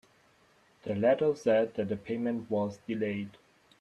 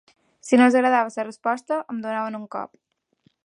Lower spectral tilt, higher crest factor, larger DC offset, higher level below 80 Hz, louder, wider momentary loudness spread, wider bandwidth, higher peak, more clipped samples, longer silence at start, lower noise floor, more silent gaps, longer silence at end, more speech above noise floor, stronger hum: first, -7 dB/octave vs -4.5 dB/octave; about the same, 20 dB vs 20 dB; neither; first, -72 dBFS vs -78 dBFS; second, -31 LUFS vs -22 LUFS; second, 11 LU vs 17 LU; about the same, 11 kHz vs 10.5 kHz; second, -12 dBFS vs -4 dBFS; neither; first, 0.85 s vs 0.45 s; about the same, -65 dBFS vs -65 dBFS; neither; second, 0.5 s vs 0.8 s; second, 35 dB vs 44 dB; neither